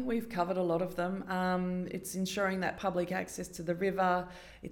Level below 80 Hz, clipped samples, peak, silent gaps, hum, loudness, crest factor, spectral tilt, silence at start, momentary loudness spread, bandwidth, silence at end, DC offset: -60 dBFS; under 0.1%; -18 dBFS; none; none; -34 LUFS; 16 dB; -5.5 dB/octave; 0 s; 7 LU; 18 kHz; 0 s; under 0.1%